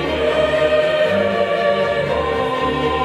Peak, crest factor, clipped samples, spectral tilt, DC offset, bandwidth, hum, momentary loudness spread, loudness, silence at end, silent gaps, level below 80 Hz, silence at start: -4 dBFS; 12 dB; under 0.1%; -5.5 dB/octave; under 0.1%; 11.5 kHz; none; 3 LU; -17 LUFS; 0 s; none; -38 dBFS; 0 s